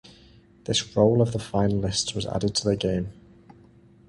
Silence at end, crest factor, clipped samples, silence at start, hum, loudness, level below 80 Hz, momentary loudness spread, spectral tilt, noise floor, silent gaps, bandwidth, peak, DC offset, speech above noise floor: 0.95 s; 20 dB; under 0.1%; 0.7 s; none; -24 LUFS; -48 dBFS; 8 LU; -5 dB/octave; -53 dBFS; none; 11.5 kHz; -6 dBFS; under 0.1%; 30 dB